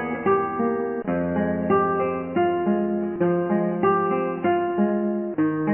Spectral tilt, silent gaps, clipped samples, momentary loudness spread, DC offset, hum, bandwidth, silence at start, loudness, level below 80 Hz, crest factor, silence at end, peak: -12 dB/octave; none; under 0.1%; 4 LU; under 0.1%; none; 3.2 kHz; 0 s; -23 LUFS; -52 dBFS; 14 dB; 0 s; -8 dBFS